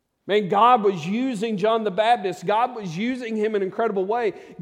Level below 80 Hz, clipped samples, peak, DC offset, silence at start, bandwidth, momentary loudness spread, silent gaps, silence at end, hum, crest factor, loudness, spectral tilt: -72 dBFS; under 0.1%; -4 dBFS; under 0.1%; 0.25 s; 11 kHz; 9 LU; none; 0.1 s; none; 18 dB; -22 LUFS; -6 dB/octave